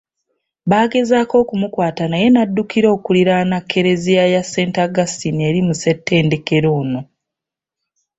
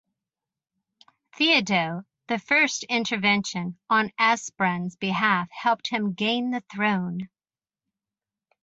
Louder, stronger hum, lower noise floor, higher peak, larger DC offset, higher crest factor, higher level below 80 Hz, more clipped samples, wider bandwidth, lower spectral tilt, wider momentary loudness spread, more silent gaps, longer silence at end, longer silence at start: first, -15 LUFS vs -24 LUFS; neither; second, -84 dBFS vs under -90 dBFS; first, -2 dBFS vs -8 dBFS; neither; second, 14 dB vs 20 dB; first, -52 dBFS vs -70 dBFS; neither; about the same, 8 kHz vs 8 kHz; first, -6 dB/octave vs -4 dB/octave; second, 6 LU vs 11 LU; neither; second, 1.15 s vs 1.4 s; second, 0.65 s vs 1.4 s